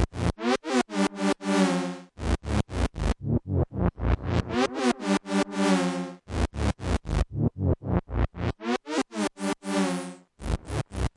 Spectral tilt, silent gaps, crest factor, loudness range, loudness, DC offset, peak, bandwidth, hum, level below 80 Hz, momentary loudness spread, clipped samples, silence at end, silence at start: -6 dB/octave; none; 16 dB; 2 LU; -28 LUFS; under 0.1%; -10 dBFS; 11.5 kHz; none; -34 dBFS; 7 LU; under 0.1%; 0.05 s; 0 s